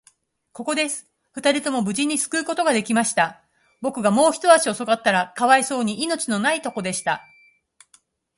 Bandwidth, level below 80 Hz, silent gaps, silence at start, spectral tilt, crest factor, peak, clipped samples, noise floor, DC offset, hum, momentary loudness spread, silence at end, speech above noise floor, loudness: 11.5 kHz; -68 dBFS; none; 0.55 s; -3 dB/octave; 22 dB; 0 dBFS; under 0.1%; -60 dBFS; under 0.1%; none; 9 LU; 1.15 s; 39 dB; -21 LUFS